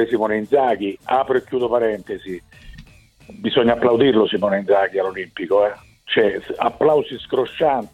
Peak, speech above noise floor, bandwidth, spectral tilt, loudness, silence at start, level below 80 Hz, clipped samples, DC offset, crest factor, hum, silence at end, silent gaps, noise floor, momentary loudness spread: -2 dBFS; 27 dB; 10.5 kHz; -6.5 dB/octave; -19 LUFS; 0 s; -52 dBFS; under 0.1%; under 0.1%; 16 dB; none; 0.05 s; none; -46 dBFS; 12 LU